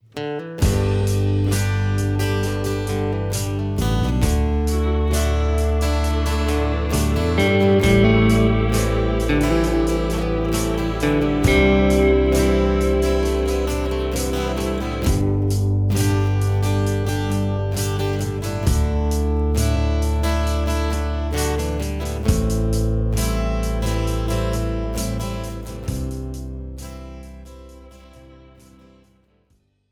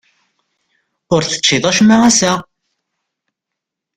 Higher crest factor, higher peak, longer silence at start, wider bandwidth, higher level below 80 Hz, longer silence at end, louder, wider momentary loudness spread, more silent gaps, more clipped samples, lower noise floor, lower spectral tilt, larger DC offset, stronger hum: about the same, 16 dB vs 16 dB; second, -4 dBFS vs 0 dBFS; second, 0.15 s vs 1.1 s; first, 18.5 kHz vs 11 kHz; first, -24 dBFS vs -50 dBFS; first, 1.75 s vs 1.55 s; second, -20 LUFS vs -12 LUFS; about the same, 9 LU vs 8 LU; neither; neither; second, -63 dBFS vs -81 dBFS; first, -6 dB/octave vs -3 dB/octave; neither; neither